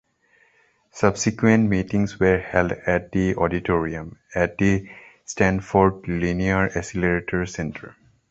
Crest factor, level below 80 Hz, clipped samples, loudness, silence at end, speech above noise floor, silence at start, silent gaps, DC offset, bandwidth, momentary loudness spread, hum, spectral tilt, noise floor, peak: 20 dB; -42 dBFS; under 0.1%; -22 LUFS; 0.4 s; 40 dB; 0.95 s; none; under 0.1%; 8 kHz; 11 LU; none; -6.5 dB/octave; -61 dBFS; -2 dBFS